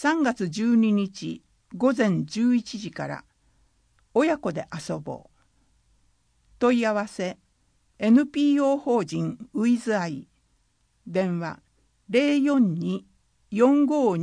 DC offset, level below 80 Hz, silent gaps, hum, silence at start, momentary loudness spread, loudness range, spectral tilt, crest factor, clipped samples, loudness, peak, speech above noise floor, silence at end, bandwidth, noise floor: under 0.1%; -64 dBFS; none; none; 0 s; 14 LU; 6 LU; -6.5 dB/octave; 16 dB; under 0.1%; -24 LUFS; -8 dBFS; 44 dB; 0 s; 10.5 kHz; -67 dBFS